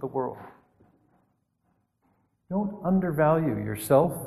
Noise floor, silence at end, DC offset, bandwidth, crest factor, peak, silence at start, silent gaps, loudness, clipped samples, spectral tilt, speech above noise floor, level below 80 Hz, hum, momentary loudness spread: -72 dBFS; 0 s; under 0.1%; 13 kHz; 20 dB; -8 dBFS; 0 s; none; -26 LUFS; under 0.1%; -7.5 dB/octave; 47 dB; -58 dBFS; none; 10 LU